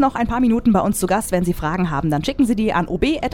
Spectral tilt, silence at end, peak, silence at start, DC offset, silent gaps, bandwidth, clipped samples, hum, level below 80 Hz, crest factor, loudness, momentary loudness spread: -6 dB/octave; 0 s; -4 dBFS; 0 s; under 0.1%; none; 17 kHz; under 0.1%; none; -34 dBFS; 14 dB; -19 LUFS; 4 LU